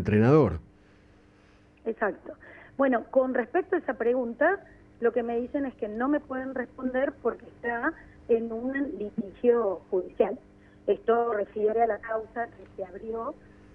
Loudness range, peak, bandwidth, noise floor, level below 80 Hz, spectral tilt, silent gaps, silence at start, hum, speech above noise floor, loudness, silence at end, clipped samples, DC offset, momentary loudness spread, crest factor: 3 LU; -10 dBFS; 6.2 kHz; -58 dBFS; -56 dBFS; -9.5 dB/octave; none; 0 s; 50 Hz at -60 dBFS; 30 dB; -28 LUFS; 0.4 s; under 0.1%; under 0.1%; 13 LU; 18 dB